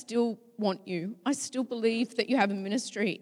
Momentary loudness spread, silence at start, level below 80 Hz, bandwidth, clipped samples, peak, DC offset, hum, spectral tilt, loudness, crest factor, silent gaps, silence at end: 6 LU; 0 s; -86 dBFS; 13 kHz; under 0.1%; -12 dBFS; under 0.1%; none; -4.5 dB/octave; -30 LUFS; 18 dB; none; 0 s